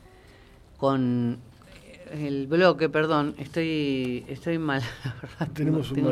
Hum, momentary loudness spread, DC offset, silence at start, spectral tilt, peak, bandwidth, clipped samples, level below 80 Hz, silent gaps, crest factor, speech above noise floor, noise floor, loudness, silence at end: none; 13 LU; under 0.1%; 0.8 s; -7 dB/octave; -6 dBFS; 14 kHz; under 0.1%; -56 dBFS; none; 20 dB; 26 dB; -52 dBFS; -26 LUFS; 0 s